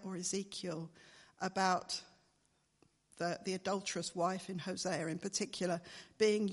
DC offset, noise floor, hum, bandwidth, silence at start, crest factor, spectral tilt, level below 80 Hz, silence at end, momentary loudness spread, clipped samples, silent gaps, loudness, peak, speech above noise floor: under 0.1%; -76 dBFS; none; 11.5 kHz; 0 s; 22 dB; -4 dB/octave; -78 dBFS; 0 s; 9 LU; under 0.1%; none; -38 LUFS; -18 dBFS; 39 dB